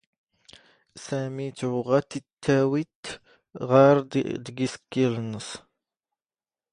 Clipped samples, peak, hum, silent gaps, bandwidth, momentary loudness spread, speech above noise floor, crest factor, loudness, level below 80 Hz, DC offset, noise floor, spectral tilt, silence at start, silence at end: under 0.1%; -4 dBFS; none; 2.33-2.37 s, 2.95-3.03 s; 10.5 kHz; 20 LU; over 65 dB; 22 dB; -25 LUFS; -64 dBFS; under 0.1%; under -90 dBFS; -6.5 dB/octave; 0.95 s; 1.15 s